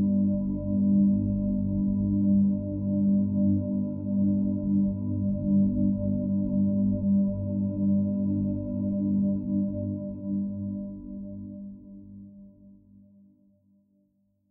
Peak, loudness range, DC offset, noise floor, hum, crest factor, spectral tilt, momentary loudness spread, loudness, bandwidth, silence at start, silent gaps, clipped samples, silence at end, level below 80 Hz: -14 dBFS; 12 LU; under 0.1%; -70 dBFS; none; 12 dB; -17.5 dB/octave; 15 LU; -27 LUFS; 1.1 kHz; 0 s; none; under 0.1%; 1.8 s; -48 dBFS